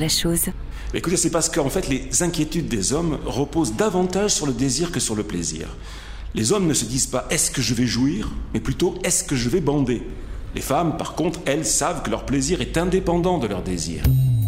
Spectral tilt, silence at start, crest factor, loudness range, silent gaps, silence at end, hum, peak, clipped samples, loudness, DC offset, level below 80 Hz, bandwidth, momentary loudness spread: -4 dB/octave; 0 s; 14 dB; 1 LU; none; 0 s; none; -8 dBFS; under 0.1%; -22 LUFS; under 0.1%; -34 dBFS; 16 kHz; 8 LU